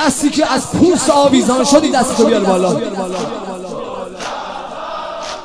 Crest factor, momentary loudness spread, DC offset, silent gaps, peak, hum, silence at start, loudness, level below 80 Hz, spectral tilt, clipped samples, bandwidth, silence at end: 14 dB; 14 LU; under 0.1%; none; 0 dBFS; none; 0 s; -14 LUFS; -44 dBFS; -4 dB/octave; 0.1%; 11 kHz; 0 s